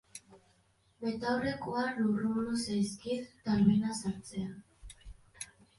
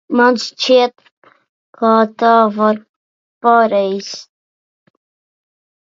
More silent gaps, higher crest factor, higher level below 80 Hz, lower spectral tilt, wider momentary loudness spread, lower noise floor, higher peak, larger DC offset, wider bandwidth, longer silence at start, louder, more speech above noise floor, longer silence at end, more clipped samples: second, none vs 1.12-1.22 s, 1.49-1.73 s, 2.89-3.41 s; about the same, 20 dB vs 16 dB; first, -60 dBFS vs -72 dBFS; about the same, -5.5 dB/octave vs -4.5 dB/octave; first, 23 LU vs 11 LU; second, -70 dBFS vs under -90 dBFS; second, -14 dBFS vs 0 dBFS; neither; first, 11.5 kHz vs 7.6 kHz; about the same, 0.15 s vs 0.1 s; second, -33 LUFS vs -14 LUFS; second, 37 dB vs over 77 dB; second, 0.35 s vs 1.65 s; neither